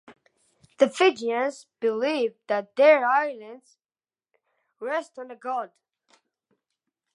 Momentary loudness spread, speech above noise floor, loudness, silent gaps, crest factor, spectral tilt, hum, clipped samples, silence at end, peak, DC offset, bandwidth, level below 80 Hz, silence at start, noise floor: 19 LU; over 66 dB; -24 LUFS; none; 22 dB; -3.5 dB/octave; none; under 0.1%; 1.5 s; -4 dBFS; under 0.1%; 11.5 kHz; -84 dBFS; 0.1 s; under -90 dBFS